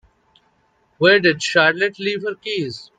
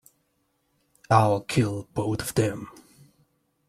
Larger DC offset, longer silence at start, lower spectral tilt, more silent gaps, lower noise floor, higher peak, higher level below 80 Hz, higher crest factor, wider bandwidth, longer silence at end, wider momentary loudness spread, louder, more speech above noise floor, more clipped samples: neither; about the same, 1 s vs 1.1 s; second, -4 dB/octave vs -6 dB/octave; neither; second, -62 dBFS vs -72 dBFS; about the same, 0 dBFS vs -2 dBFS; second, -64 dBFS vs -56 dBFS; second, 18 dB vs 24 dB; second, 9.4 kHz vs 15 kHz; second, 0.15 s vs 1 s; about the same, 11 LU vs 11 LU; first, -17 LUFS vs -25 LUFS; second, 44 dB vs 48 dB; neither